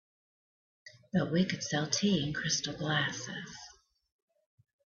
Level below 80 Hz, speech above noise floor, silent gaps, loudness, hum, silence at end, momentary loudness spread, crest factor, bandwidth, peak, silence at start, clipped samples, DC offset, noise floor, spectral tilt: -66 dBFS; 25 dB; none; -32 LUFS; none; 1.25 s; 14 LU; 20 dB; 7.6 kHz; -14 dBFS; 0.85 s; under 0.1%; under 0.1%; -57 dBFS; -4 dB/octave